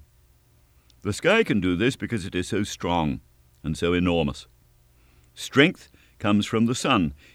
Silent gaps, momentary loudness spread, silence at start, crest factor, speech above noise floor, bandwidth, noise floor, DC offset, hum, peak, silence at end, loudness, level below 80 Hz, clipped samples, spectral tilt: none; 14 LU; 1.05 s; 24 dB; 36 dB; 15.5 kHz; -59 dBFS; under 0.1%; none; -2 dBFS; 0.2 s; -24 LUFS; -48 dBFS; under 0.1%; -5 dB/octave